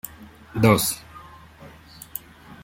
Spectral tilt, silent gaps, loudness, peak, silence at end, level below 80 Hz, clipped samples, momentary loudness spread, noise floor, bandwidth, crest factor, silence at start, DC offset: -5 dB/octave; none; -21 LUFS; -2 dBFS; 0.1 s; -52 dBFS; under 0.1%; 26 LU; -46 dBFS; 16.5 kHz; 24 dB; 0.05 s; under 0.1%